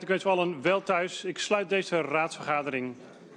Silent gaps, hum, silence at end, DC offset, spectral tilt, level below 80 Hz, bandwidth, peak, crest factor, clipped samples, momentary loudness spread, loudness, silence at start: none; none; 0 s; under 0.1%; -4.5 dB/octave; -76 dBFS; 11 kHz; -12 dBFS; 18 dB; under 0.1%; 7 LU; -28 LUFS; 0 s